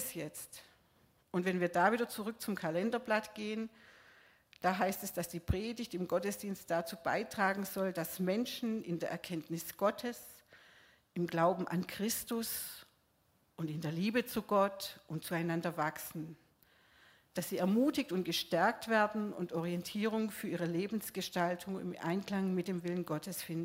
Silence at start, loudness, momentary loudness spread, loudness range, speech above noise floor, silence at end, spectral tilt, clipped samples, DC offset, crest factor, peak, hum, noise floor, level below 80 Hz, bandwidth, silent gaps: 0 s; -36 LUFS; 11 LU; 4 LU; 38 dB; 0 s; -5 dB/octave; under 0.1%; under 0.1%; 22 dB; -16 dBFS; none; -74 dBFS; -62 dBFS; 16 kHz; none